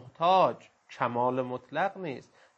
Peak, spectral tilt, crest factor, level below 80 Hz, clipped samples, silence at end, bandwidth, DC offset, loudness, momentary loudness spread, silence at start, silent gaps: -12 dBFS; -6.5 dB/octave; 18 dB; -78 dBFS; under 0.1%; 0.35 s; 8 kHz; under 0.1%; -29 LUFS; 16 LU; 0 s; none